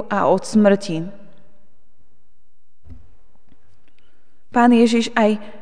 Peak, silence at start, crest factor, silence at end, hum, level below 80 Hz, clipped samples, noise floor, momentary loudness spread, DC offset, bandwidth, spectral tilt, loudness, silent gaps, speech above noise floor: -2 dBFS; 0 s; 18 dB; 0.1 s; none; -56 dBFS; under 0.1%; -66 dBFS; 13 LU; 3%; 10 kHz; -5.5 dB/octave; -17 LUFS; none; 49 dB